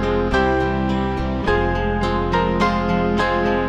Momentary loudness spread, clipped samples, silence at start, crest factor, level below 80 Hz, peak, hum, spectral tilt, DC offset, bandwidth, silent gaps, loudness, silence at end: 3 LU; under 0.1%; 0 s; 14 dB; -28 dBFS; -6 dBFS; none; -7 dB/octave; under 0.1%; 9.8 kHz; none; -19 LUFS; 0 s